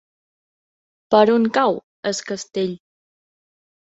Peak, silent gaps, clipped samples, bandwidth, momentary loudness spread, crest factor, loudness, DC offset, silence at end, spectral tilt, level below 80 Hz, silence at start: -2 dBFS; 1.83-2.03 s; under 0.1%; 8 kHz; 12 LU; 20 dB; -19 LUFS; under 0.1%; 1.1 s; -4.5 dB/octave; -64 dBFS; 1.1 s